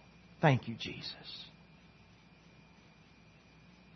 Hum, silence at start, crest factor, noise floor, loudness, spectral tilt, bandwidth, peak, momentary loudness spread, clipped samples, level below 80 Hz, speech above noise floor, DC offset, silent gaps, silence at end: none; 0.4 s; 28 dB; -61 dBFS; -35 LUFS; -5 dB/octave; 6.2 kHz; -12 dBFS; 21 LU; under 0.1%; -70 dBFS; 27 dB; under 0.1%; none; 2.45 s